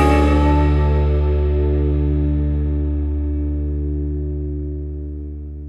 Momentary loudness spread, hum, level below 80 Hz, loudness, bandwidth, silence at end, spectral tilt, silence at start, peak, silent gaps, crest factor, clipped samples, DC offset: 12 LU; none; -20 dBFS; -19 LUFS; 5.4 kHz; 0 s; -9 dB/octave; 0 s; -2 dBFS; none; 16 dB; under 0.1%; under 0.1%